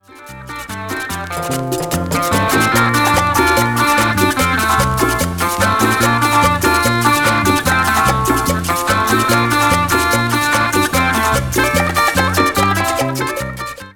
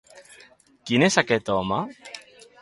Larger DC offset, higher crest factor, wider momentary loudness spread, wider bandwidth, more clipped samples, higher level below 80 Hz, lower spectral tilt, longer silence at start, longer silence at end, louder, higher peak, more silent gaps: neither; second, 14 dB vs 22 dB; second, 9 LU vs 22 LU; first, 19.5 kHz vs 11.5 kHz; neither; first, -32 dBFS vs -58 dBFS; about the same, -4 dB/octave vs -4.5 dB/octave; about the same, 0.15 s vs 0.15 s; second, 0.05 s vs 0.4 s; first, -14 LUFS vs -22 LUFS; about the same, 0 dBFS vs -2 dBFS; neither